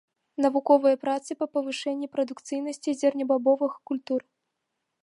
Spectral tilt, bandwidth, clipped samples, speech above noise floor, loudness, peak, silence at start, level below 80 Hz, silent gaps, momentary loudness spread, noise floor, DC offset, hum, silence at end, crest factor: -3.5 dB/octave; 11 kHz; under 0.1%; 56 dB; -26 LUFS; -8 dBFS; 0.4 s; -80 dBFS; none; 11 LU; -81 dBFS; under 0.1%; none; 0.8 s; 20 dB